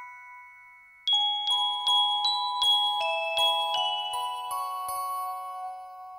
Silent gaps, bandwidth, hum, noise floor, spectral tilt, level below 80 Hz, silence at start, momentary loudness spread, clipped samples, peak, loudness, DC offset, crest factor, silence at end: none; 16 kHz; none; -53 dBFS; 2.5 dB/octave; -74 dBFS; 0 s; 16 LU; under 0.1%; -14 dBFS; -25 LUFS; under 0.1%; 14 dB; 0 s